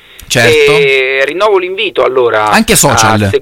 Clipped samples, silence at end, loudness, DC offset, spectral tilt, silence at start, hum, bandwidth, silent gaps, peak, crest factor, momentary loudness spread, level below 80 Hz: 0.3%; 0 s; -8 LUFS; under 0.1%; -3.5 dB/octave; 0.2 s; none; over 20 kHz; none; 0 dBFS; 8 dB; 5 LU; -34 dBFS